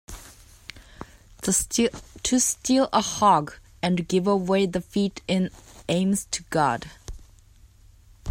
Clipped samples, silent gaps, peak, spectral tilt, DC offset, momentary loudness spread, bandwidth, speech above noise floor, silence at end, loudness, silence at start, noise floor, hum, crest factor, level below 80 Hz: under 0.1%; none; -6 dBFS; -4 dB/octave; under 0.1%; 23 LU; 16 kHz; 29 dB; 0 s; -24 LUFS; 0.1 s; -53 dBFS; none; 20 dB; -48 dBFS